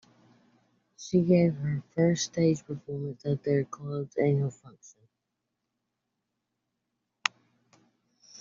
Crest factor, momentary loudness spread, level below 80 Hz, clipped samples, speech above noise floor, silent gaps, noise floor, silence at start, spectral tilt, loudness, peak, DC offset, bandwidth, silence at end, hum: 28 dB; 12 LU; -68 dBFS; under 0.1%; 56 dB; none; -84 dBFS; 1 s; -6.5 dB/octave; -29 LUFS; -2 dBFS; under 0.1%; 7.4 kHz; 0.05 s; none